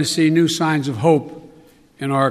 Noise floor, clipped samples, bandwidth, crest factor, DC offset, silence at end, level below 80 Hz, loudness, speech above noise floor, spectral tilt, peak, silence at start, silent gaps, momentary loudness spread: -48 dBFS; under 0.1%; 14.5 kHz; 16 dB; under 0.1%; 0 s; -62 dBFS; -18 LUFS; 31 dB; -5.5 dB/octave; -2 dBFS; 0 s; none; 10 LU